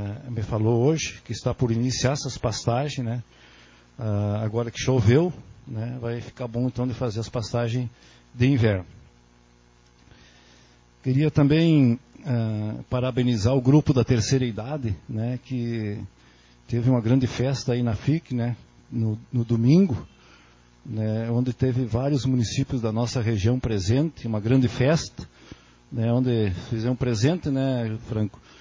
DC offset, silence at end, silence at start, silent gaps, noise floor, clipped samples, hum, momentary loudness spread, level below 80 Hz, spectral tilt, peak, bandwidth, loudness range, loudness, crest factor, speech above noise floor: under 0.1%; 0.3 s; 0 s; none; -56 dBFS; under 0.1%; 60 Hz at -45 dBFS; 12 LU; -46 dBFS; -7 dB/octave; -6 dBFS; 7.6 kHz; 4 LU; -24 LUFS; 18 dB; 33 dB